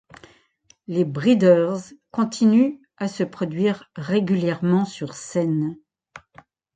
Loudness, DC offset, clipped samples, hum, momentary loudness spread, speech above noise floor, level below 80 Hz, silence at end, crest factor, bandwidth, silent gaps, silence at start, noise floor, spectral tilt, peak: -22 LUFS; under 0.1%; under 0.1%; none; 13 LU; 39 dB; -66 dBFS; 0.55 s; 18 dB; 9.2 kHz; none; 0.9 s; -59 dBFS; -7 dB/octave; -4 dBFS